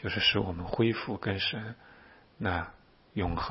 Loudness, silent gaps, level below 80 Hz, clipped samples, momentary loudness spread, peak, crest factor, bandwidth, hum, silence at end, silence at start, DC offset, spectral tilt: -31 LUFS; none; -50 dBFS; under 0.1%; 16 LU; -14 dBFS; 18 dB; 5.8 kHz; none; 0 s; 0 s; under 0.1%; -9 dB/octave